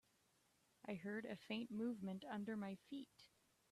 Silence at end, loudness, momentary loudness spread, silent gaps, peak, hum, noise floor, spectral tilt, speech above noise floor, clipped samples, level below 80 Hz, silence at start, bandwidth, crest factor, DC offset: 0.45 s; -49 LUFS; 11 LU; none; -34 dBFS; none; -80 dBFS; -6.5 dB/octave; 31 dB; under 0.1%; -86 dBFS; 0.85 s; 13.5 kHz; 16 dB; under 0.1%